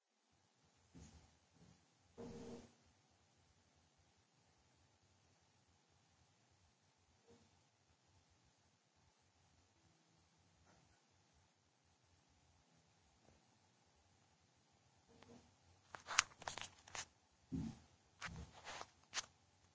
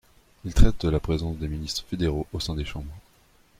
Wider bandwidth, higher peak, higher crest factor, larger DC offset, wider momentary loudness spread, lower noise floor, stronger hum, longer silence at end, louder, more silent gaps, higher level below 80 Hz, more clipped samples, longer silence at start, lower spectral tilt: second, 8 kHz vs 13.5 kHz; second, -10 dBFS vs -4 dBFS; first, 46 dB vs 20 dB; neither; first, 27 LU vs 13 LU; first, -81 dBFS vs -59 dBFS; neither; second, 0.4 s vs 0.6 s; second, -47 LUFS vs -27 LUFS; neither; second, -74 dBFS vs -28 dBFS; neither; first, 0.95 s vs 0.45 s; second, -2 dB/octave vs -6 dB/octave